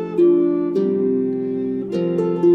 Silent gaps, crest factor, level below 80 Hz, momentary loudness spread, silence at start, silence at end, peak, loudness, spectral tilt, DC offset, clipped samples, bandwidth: none; 12 dB; -60 dBFS; 8 LU; 0 s; 0 s; -6 dBFS; -19 LUFS; -10 dB/octave; under 0.1%; under 0.1%; 4.9 kHz